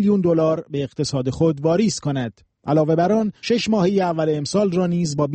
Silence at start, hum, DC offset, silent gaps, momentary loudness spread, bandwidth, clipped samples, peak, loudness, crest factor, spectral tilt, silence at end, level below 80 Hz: 0 s; none; under 0.1%; none; 7 LU; 8.8 kHz; under 0.1%; -6 dBFS; -20 LUFS; 12 dB; -6.5 dB/octave; 0 s; -52 dBFS